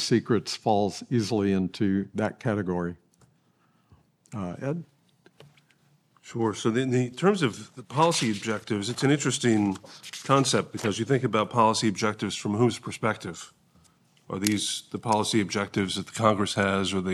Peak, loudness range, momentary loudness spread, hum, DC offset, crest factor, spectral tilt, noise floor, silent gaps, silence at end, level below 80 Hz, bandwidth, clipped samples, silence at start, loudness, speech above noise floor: -4 dBFS; 9 LU; 11 LU; none; under 0.1%; 22 dB; -5 dB/octave; -66 dBFS; none; 0 s; -70 dBFS; 14.5 kHz; under 0.1%; 0 s; -26 LUFS; 40 dB